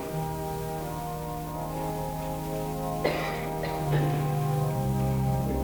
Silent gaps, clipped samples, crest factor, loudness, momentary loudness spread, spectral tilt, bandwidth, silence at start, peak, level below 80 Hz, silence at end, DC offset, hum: none; under 0.1%; 16 dB; -30 LUFS; 7 LU; -6.5 dB/octave; over 20 kHz; 0 s; -14 dBFS; -42 dBFS; 0 s; under 0.1%; none